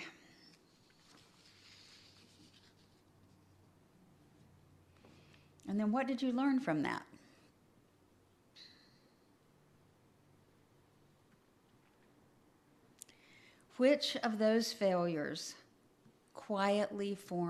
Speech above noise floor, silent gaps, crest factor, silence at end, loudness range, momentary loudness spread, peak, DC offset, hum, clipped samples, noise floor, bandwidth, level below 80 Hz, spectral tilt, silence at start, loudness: 35 dB; none; 22 dB; 0 s; 9 LU; 26 LU; -18 dBFS; under 0.1%; none; under 0.1%; -69 dBFS; 14 kHz; -82 dBFS; -5 dB/octave; 0 s; -35 LUFS